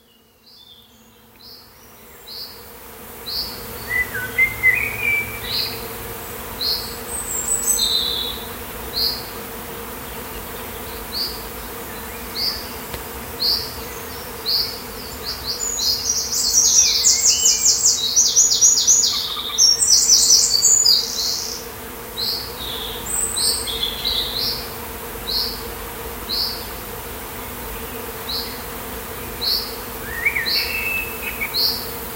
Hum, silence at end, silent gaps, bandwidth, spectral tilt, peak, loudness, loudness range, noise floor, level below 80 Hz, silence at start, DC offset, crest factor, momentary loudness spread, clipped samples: none; 0 s; none; 16 kHz; 0.5 dB/octave; 0 dBFS; -17 LUFS; 14 LU; -52 dBFS; -42 dBFS; 0.55 s; under 0.1%; 22 dB; 18 LU; under 0.1%